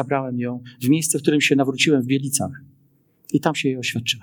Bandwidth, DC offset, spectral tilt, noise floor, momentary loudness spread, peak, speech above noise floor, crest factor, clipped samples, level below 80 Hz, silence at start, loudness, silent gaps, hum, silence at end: 19 kHz; under 0.1%; -4 dB/octave; -60 dBFS; 9 LU; -2 dBFS; 39 dB; 20 dB; under 0.1%; -68 dBFS; 0 s; -20 LUFS; none; none; 0 s